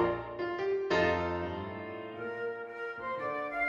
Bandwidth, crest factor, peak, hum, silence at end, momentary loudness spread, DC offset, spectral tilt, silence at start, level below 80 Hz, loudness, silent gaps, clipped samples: 7.6 kHz; 18 dB; -16 dBFS; none; 0 s; 12 LU; under 0.1%; -6.5 dB/octave; 0 s; -58 dBFS; -34 LUFS; none; under 0.1%